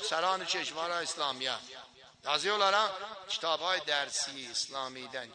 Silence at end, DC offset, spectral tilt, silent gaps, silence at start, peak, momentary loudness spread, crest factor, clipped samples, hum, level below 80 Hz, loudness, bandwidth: 0 s; under 0.1%; -0.5 dB/octave; none; 0 s; -12 dBFS; 13 LU; 22 dB; under 0.1%; none; -78 dBFS; -32 LUFS; 10.5 kHz